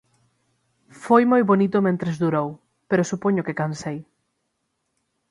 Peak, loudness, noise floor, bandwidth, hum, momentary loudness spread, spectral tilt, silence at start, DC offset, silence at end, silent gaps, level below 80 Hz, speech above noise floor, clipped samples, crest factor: -2 dBFS; -21 LUFS; -75 dBFS; 11.5 kHz; none; 15 LU; -7 dB/octave; 1 s; under 0.1%; 1.3 s; none; -64 dBFS; 55 dB; under 0.1%; 20 dB